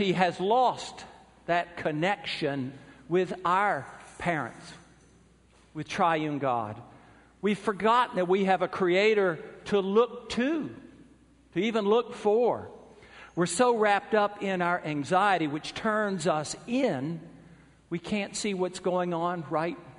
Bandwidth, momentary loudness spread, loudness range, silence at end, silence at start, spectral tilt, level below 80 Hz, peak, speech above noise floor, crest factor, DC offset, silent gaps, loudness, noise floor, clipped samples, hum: 10.5 kHz; 14 LU; 5 LU; 0.05 s; 0 s; -5 dB/octave; -64 dBFS; -8 dBFS; 32 dB; 22 dB; under 0.1%; none; -28 LUFS; -60 dBFS; under 0.1%; none